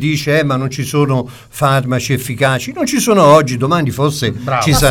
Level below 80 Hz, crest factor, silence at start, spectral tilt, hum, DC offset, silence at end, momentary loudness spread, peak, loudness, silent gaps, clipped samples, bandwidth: -34 dBFS; 14 dB; 0 s; -5 dB/octave; none; under 0.1%; 0 s; 8 LU; 0 dBFS; -14 LUFS; none; under 0.1%; 18 kHz